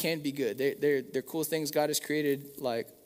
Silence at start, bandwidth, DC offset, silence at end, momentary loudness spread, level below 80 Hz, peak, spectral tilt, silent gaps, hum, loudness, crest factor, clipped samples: 0 s; 16 kHz; under 0.1%; 0.1 s; 5 LU; -76 dBFS; -14 dBFS; -4 dB/octave; none; none; -31 LUFS; 16 dB; under 0.1%